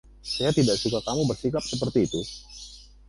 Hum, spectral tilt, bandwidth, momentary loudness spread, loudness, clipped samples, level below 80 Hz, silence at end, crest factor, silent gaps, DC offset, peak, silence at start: 50 Hz at -45 dBFS; -5 dB/octave; 11.5 kHz; 18 LU; -26 LUFS; under 0.1%; -48 dBFS; 0.25 s; 16 dB; none; under 0.1%; -10 dBFS; 0.25 s